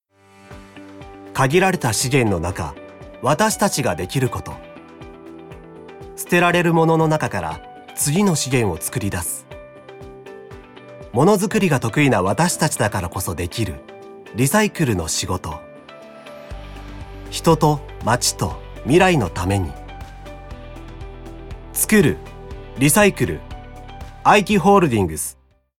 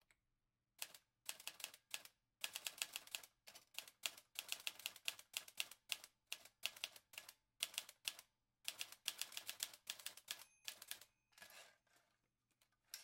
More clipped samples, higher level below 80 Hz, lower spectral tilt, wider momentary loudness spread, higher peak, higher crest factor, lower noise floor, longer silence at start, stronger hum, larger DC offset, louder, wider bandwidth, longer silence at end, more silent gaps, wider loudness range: neither; first, -40 dBFS vs under -90 dBFS; first, -4.5 dB/octave vs 2.5 dB/octave; first, 24 LU vs 14 LU; first, 0 dBFS vs -18 dBFS; second, 20 dB vs 36 dB; second, -49 dBFS vs under -90 dBFS; second, 0.5 s vs 0.8 s; neither; neither; first, -18 LUFS vs -50 LUFS; about the same, 17.5 kHz vs 16 kHz; first, 0.45 s vs 0 s; neither; about the same, 5 LU vs 3 LU